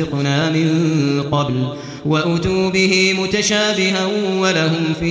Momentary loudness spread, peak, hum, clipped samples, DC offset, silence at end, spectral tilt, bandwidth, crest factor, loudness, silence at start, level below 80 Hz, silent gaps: 5 LU; -2 dBFS; none; under 0.1%; under 0.1%; 0 s; -4.5 dB/octave; 8 kHz; 14 dB; -16 LUFS; 0 s; -44 dBFS; none